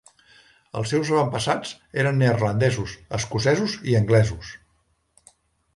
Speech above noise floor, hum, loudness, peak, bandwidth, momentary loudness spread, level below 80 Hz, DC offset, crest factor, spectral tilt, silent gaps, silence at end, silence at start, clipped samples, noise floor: 45 dB; none; -22 LUFS; -6 dBFS; 11.5 kHz; 10 LU; -48 dBFS; under 0.1%; 18 dB; -6 dB/octave; none; 1.2 s; 0.75 s; under 0.1%; -67 dBFS